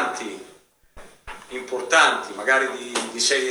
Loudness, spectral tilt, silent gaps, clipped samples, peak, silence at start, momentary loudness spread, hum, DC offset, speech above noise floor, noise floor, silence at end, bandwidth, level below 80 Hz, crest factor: -21 LUFS; 0 dB/octave; none; under 0.1%; -2 dBFS; 0 s; 21 LU; none; under 0.1%; 31 dB; -53 dBFS; 0 s; over 20 kHz; -56 dBFS; 22 dB